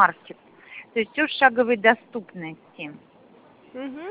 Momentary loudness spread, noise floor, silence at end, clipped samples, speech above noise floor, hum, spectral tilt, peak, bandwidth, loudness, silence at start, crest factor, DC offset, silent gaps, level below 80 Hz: 23 LU; -53 dBFS; 0 s; under 0.1%; 29 dB; none; -7.5 dB/octave; -2 dBFS; 4 kHz; -21 LUFS; 0 s; 22 dB; under 0.1%; none; -72 dBFS